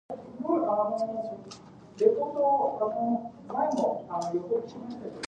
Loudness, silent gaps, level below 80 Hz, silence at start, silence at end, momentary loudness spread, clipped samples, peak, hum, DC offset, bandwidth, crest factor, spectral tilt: -29 LUFS; none; -70 dBFS; 0.1 s; 0 s; 14 LU; under 0.1%; -8 dBFS; none; under 0.1%; 9.8 kHz; 20 dB; -6.5 dB/octave